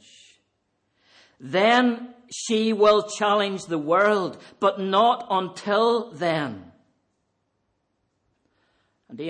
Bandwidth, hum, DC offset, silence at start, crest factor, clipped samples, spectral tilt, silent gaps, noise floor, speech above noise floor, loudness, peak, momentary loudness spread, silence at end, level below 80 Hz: 9.8 kHz; none; under 0.1%; 1.4 s; 18 dB; under 0.1%; -4.5 dB/octave; none; -74 dBFS; 52 dB; -22 LUFS; -6 dBFS; 13 LU; 0 s; -70 dBFS